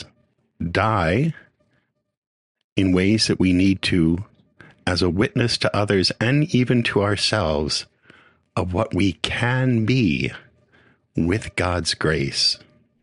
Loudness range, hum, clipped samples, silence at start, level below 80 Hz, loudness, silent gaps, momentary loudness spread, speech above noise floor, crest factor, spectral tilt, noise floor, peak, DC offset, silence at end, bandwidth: 3 LU; none; under 0.1%; 0 s; -44 dBFS; -21 LUFS; 2.17-2.55 s, 2.64-2.76 s; 10 LU; 48 dB; 20 dB; -5.5 dB/octave; -68 dBFS; 0 dBFS; under 0.1%; 0.45 s; 11 kHz